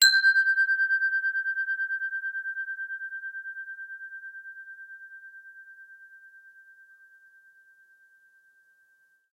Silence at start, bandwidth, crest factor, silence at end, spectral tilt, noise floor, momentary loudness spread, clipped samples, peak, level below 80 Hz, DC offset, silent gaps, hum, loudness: 0 s; 16 kHz; 24 dB; 2.85 s; 9 dB/octave; -65 dBFS; 25 LU; under 0.1%; -6 dBFS; under -90 dBFS; under 0.1%; none; none; -26 LUFS